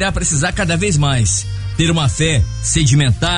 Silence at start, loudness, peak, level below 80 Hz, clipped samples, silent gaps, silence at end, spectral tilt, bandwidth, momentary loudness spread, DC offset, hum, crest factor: 0 s; -15 LUFS; -2 dBFS; -26 dBFS; under 0.1%; none; 0 s; -4 dB/octave; 11 kHz; 4 LU; under 0.1%; none; 12 dB